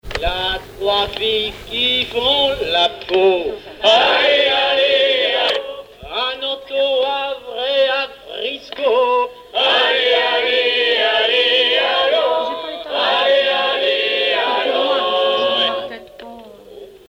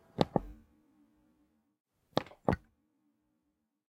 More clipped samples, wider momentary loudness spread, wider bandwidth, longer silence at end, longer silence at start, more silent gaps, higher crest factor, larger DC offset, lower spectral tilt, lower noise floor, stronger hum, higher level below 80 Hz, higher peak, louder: neither; first, 11 LU vs 6 LU; about the same, 16 kHz vs 16 kHz; second, 0.2 s vs 1.35 s; second, 0.05 s vs 0.2 s; second, none vs 1.80-1.85 s; second, 14 dB vs 32 dB; neither; second, -3 dB/octave vs -7 dB/octave; second, -38 dBFS vs -82 dBFS; neither; first, -42 dBFS vs -58 dBFS; first, -2 dBFS vs -6 dBFS; first, -16 LUFS vs -36 LUFS